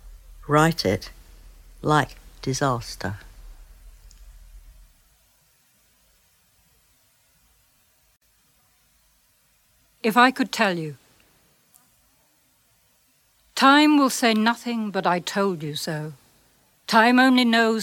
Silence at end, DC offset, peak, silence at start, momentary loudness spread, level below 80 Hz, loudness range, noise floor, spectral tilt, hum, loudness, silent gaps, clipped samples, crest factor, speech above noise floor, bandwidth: 0 s; under 0.1%; -2 dBFS; 0.05 s; 17 LU; -52 dBFS; 11 LU; -63 dBFS; -4.5 dB/octave; none; -21 LUFS; none; under 0.1%; 22 dB; 43 dB; 18 kHz